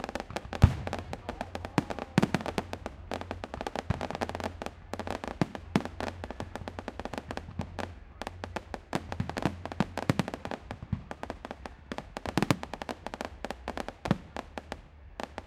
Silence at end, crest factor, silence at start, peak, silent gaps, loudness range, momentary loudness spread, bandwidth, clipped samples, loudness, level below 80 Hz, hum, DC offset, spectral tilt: 0 s; 32 dB; 0 s; -2 dBFS; none; 6 LU; 12 LU; 16 kHz; under 0.1%; -35 LUFS; -44 dBFS; none; under 0.1%; -6 dB/octave